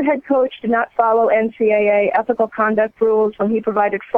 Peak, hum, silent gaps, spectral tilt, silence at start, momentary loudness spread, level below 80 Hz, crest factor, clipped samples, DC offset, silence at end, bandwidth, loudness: -2 dBFS; none; none; -8.5 dB/octave; 0 s; 4 LU; -58 dBFS; 14 dB; under 0.1%; under 0.1%; 0 s; 3.8 kHz; -17 LUFS